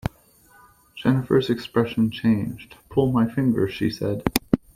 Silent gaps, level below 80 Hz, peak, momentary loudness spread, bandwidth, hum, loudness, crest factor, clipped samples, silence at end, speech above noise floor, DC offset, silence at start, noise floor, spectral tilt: none; -46 dBFS; 0 dBFS; 7 LU; 16 kHz; none; -23 LUFS; 22 dB; under 0.1%; 0.2 s; 33 dB; under 0.1%; 0.05 s; -55 dBFS; -6.5 dB/octave